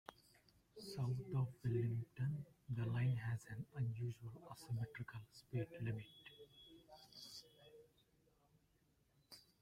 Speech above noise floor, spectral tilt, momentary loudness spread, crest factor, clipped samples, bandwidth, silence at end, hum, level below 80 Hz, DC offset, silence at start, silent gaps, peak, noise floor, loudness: 34 dB; -7 dB/octave; 21 LU; 16 dB; under 0.1%; 14.5 kHz; 0.2 s; none; -74 dBFS; under 0.1%; 0.1 s; none; -30 dBFS; -78 dBFS; -45 LUFS